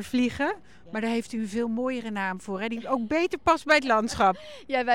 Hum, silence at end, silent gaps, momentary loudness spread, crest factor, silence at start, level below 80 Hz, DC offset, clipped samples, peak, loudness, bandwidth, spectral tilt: none; 0 s; none; 10 LU; 18 dB; 0 s; -56 dBFS; 0.3%; under 0.1%; -8 dBFS; -26 LUFS; 16 kHz; -4.5 dB/octave